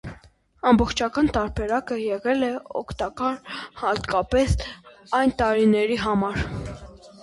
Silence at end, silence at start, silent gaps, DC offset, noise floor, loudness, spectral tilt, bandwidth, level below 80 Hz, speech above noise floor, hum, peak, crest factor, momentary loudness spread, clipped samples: 0 s; 0.05 s; none; under 0.1%; -53 dBFS; -23 LUFS; -6 dB/octave; 11.5 kHz; -38 dBFS; 30 dB; none; -6 dBFS; 18 dB; 14 LU; under 0.1%